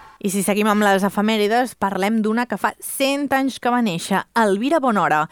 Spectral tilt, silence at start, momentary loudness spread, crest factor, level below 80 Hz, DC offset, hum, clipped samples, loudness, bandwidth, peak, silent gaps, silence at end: -4.5 dB/octave; 0 s; 5 LU; 14 dB; -62 dBFS; under 0.1%; none; under 0.1%; -19 LUFS; over 20 kHz; -4 dBFS; none; 0.05 s